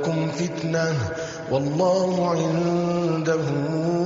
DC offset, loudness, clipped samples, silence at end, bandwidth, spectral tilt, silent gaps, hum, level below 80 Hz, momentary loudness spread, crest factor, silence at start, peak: under 0.1%; -23 LUFS; under 0.1%; 0 s; 7.8 kHz; -6.5 dB/octave; none; none; -56 dBFS; 5 LU; 12 dB; 0 s; -10 dBFS